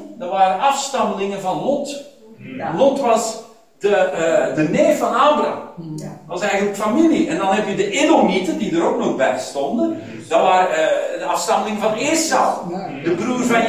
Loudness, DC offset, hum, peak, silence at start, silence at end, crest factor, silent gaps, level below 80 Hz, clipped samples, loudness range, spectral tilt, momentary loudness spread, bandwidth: -18 LUFS; 0.2%; none; -2 dBFS; 0 s; 0 s; 16 dB; none; -60 dBFS; under 0.1%; 2 LU; -4 dB/octave; 11 LU; 16 kHz